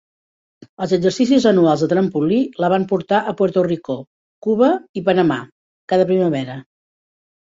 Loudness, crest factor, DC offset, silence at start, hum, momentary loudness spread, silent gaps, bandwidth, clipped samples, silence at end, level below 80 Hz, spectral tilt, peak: -17 LUFS; 16 dB; under 0.1%; 0.8 s; none; 12 LU; 4.07-4.42 s, 4.89-4.94 s, 5.52-5.88 s; 7.8 kHz; under 0.1%; 0.9 s; -60 dBFS; -7 dB/octave; -2 dBFS